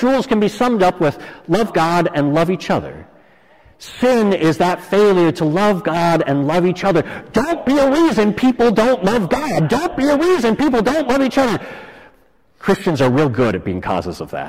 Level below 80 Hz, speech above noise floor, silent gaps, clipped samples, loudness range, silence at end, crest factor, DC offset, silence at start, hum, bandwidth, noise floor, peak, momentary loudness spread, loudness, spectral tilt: -44 dBFS; 39 dB; none; under 0.1%; 3 LU; 0 s; 10 dB; under 0.1%; 0 s; none; 16 kHz; -55 dBFS; -6 dBFS; 7 LU; -16 LUFS; -6.5 dB/octave